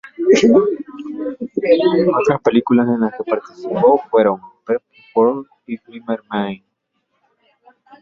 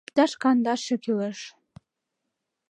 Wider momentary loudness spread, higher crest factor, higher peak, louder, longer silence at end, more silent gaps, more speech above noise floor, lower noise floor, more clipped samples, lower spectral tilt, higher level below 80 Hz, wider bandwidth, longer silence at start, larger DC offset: about the same, 15 LU vs 15 LU; about the same, 16 dB vs 20 dB; first, 0 dBFS vs -8 dBFS; first, -17 LUFS vs -25 LUFS; first, 1.45 s vs 1.2 s; neither; second, 54 dB vs 58 dB; second, -70 dBFS vs -82 dBFS; neither; first, -6 dB/octave vs -4.5 dB/octave; first, -58 dBFS vs -74 dBFS; second, 7.6 kHz vs 10 kHz; about the same, 0.05 s vs 0.15 s; neither